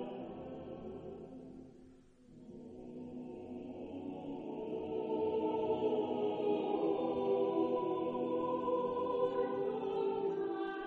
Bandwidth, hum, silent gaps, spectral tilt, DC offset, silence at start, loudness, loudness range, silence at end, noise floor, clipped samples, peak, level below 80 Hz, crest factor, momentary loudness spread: 4.7 kHz; none; none; -8.5 dB/octave; under 0.1%; 0 s; -37 LUFS; 14 LU; 0 s; -60 dBFS; under 0.1%; -22 dBFS; -70 dBFS; 16 dB; 16 LU